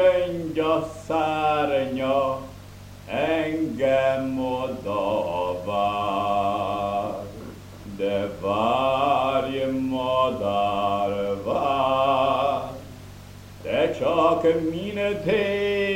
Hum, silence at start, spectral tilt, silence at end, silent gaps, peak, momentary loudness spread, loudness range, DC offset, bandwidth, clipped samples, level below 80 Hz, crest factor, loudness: none; 0 s; -6 dB/octave; 0 s; none; -8 dBFS; 16 LU; 2 LU; under 0.1%; 16 kHz; under 0.1%; -50 dBFS; 16 dB; -24 LUFS